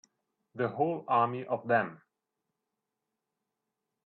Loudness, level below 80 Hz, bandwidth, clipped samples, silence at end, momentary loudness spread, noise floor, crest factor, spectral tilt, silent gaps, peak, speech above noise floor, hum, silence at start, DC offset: -31 LUFS; -82 dBFS; 6.2 kHz; under 0.1%; 2.1 s; 9 LU; -87 dBFS; 20 dB; -8 dB/octave; none; -14 dBFS; 57 dB; none; 0.55 s; under 0.1%